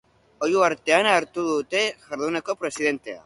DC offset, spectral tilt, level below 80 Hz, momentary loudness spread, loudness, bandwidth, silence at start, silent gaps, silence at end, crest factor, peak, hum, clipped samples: under 0.1%; -3 dB/octave; -66 dBFS; 9 LU; -23 LUFS; 11.5 kHz; 0.4 s; none; 0.05 s; 18 dB; -6 dBFS; none; under 0.1%